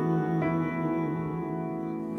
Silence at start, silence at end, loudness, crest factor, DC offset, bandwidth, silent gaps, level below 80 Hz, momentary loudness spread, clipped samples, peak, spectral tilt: 0 s; 0 s; -30 LUFS; 12 dB; under 0.1%; 6 kHz; none; -58 dBFS; 6 LU; under 0.1%; -18 dBFS; -10 dB/octave